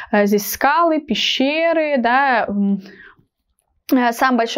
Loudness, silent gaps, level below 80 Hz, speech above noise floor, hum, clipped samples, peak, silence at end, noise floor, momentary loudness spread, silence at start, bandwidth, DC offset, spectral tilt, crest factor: -17 LUFS; none; -56 dBFS; 52 dB; none; under 0.1%; -2 dBFS; 0 s; -68 dBFS; 5 LU; 0 s; 16 kHz; under 0.1%; -4 dB/octave; 16 dB